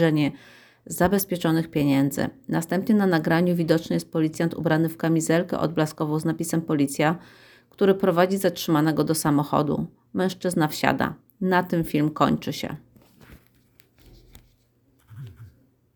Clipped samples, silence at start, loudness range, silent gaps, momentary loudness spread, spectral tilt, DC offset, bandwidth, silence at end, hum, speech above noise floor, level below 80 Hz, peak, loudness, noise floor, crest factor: under 0.1%; 0 s; 4 LU; none; 9 LU; -6 dB/octave; under 0.1%; over 20 kHz; 0.45 s; none; 40 dB; -56 dBFS; -2 dBFS; -23 LUFS; -63 dBFS; 22 dB